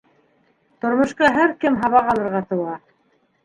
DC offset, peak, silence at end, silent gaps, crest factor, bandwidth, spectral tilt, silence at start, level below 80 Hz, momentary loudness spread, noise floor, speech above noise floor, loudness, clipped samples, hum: under 0.1%; -2 dBFS; 0.7 s; none; 20 dB; 11 kHz; -6 dB/octave; 0.85 s; -54 dBFS; 11 LU; -63 dBFS; 45 dB; -19 LUFS; under 0.1%; none